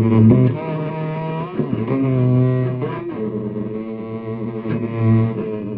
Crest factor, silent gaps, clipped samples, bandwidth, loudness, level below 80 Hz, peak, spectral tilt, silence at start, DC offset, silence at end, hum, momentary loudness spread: 16 dB; none; under 0.1%; 4.1 kHz; -20 LUFS; -48 dBFS; -2 dBFS; -13 dB/octave; 0 s; under 0.1%; 0 s; none; 12 LU